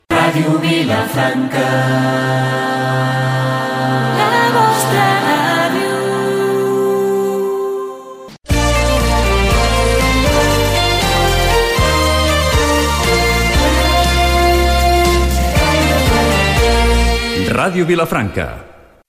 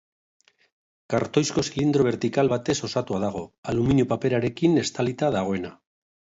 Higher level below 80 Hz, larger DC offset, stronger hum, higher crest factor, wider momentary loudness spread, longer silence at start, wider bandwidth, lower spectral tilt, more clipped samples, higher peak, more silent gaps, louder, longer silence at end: first, -20 dBFS vs -52 dBFS; neither; neither; second, 12 dB vs 18 dB; second, 4 LU vs 7 LU; second, 0.1 s vs 1.1 s; first, 16 kHz vs 8 kHz; second, -4.5 dB/octave vs -6 dB/octave; neither; first, 0 dBFS vs -6 dBFS; second, none vs 3.58-3.63 s; first, -14 LUFS vs -24 LUFS; second, 0.35 s vs 0.7 s